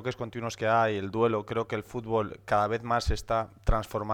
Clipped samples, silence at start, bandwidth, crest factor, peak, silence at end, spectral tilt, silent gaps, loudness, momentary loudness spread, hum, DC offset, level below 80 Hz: under 0.1%; 0 s; 18 kHz; 18 dB; -12 dBFS; 0 s; -6 dB/octave; none; -29 LUFS; 8 LU; none; under 0.1%; -38 dBFS